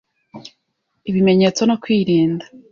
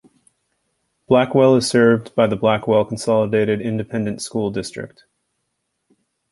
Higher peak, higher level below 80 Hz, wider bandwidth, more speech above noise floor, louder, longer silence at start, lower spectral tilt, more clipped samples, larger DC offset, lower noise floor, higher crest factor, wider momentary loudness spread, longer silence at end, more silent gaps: about the same, -4 dBFS vs -2 dBFS; about the same, -56 dBFS vs -54 dBFS; second, 7.4 kHz vs 11.5 kHz; about the same, 55 dB vs 57 dB; about the same, -17 LUFS vs -18 LUFS; second, 0.35 s vs 1.1 s; about the same, -6 dB/octave vs -6 dB/octave; neither; neither; about the same, -71 dBFS vs -74 dBFS; about the same, 14 dB vs 18 dB; about the same, 11 LU vs 10 LU; second, 0.3 s vs 1.45 s; neither